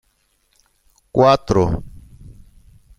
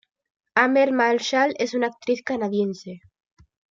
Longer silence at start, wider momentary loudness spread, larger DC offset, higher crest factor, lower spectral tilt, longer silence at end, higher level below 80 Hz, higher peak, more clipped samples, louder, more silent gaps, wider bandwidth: first, 1.15 s vs 0.55 s; about the same, 10 LU vs 9 LU; neither; about the same, 20 dB vs 20 dB; first, -7 dB/octave vs -4.5 dB/octave; first, 1.1 s vs 0.75 s; first, -38 dBFS vs -70 dBFS; about the same, -2 dBFS vs -2 dBFS; neither; first, -17 LUFS vs -22 LUFS; neither; first, 12 kHz vs 7.6 kHz